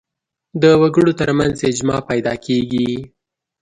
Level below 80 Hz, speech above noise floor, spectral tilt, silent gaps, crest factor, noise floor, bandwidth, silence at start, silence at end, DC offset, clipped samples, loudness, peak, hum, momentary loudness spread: -46 dBFS; 60 dB; -6 dB/octave; none; 16 dB; -76 dBFS; 10.5 kHz; 0.55 s; 0.55 s; under 0.1%; under 0.1%; -16 LUFS; 0 dBFS; none; 9 LU